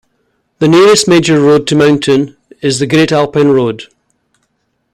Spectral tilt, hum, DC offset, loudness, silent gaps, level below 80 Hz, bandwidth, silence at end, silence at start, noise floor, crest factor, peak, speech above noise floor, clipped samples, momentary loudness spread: -5 dB/octave; none; under 0.1%; -9 LUFS; none; -48 dBFS; 15.5 kHz; 1.1 s; 0.6 s; -63 dBFS; 10 dB; 0 dBFS; 55 dB; under 0.1%; 11 LU